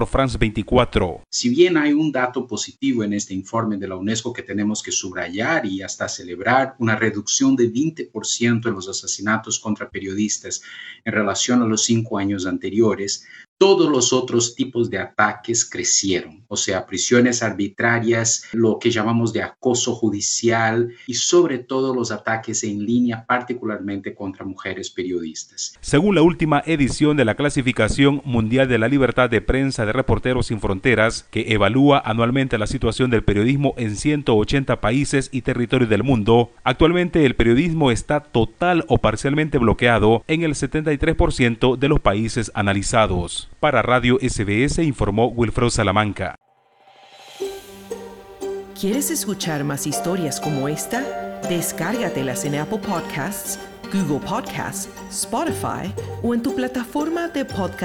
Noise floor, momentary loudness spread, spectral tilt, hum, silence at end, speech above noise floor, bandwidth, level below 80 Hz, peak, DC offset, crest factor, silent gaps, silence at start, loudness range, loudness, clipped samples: -54 dBFS; 10 LU; -4.5 dB/octave; none; 0 s; 35 dB; 17 kHz; -38 dBFS; -2 dBFS; under 0.1%; 18 dB; 13.48-13.56 s; 0 s; 6 LU; -20 LUFS; under 0.1%